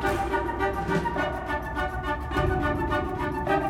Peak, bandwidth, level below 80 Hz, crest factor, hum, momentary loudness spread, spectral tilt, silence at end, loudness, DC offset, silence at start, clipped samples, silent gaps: -12 dBFS; 17 kHz; -36 dBFS; 14 dB; none; 4 LU; -6.5 dB/octave; 0 s; -28 LUFS; under 0.1%; 0 s; under 0.1%; none